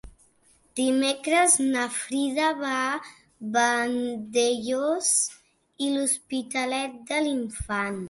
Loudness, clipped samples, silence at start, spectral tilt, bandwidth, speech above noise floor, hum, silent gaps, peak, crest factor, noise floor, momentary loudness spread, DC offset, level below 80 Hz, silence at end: -25 LUFS; under 0.1%; 0.05 s; -2 dB/octave; 12 kHz; 37 dB; none; none; -6 dBFS; 20 dB; -62 dBFS; 9 LU; under 0.1%; -54 dBFS; 0 s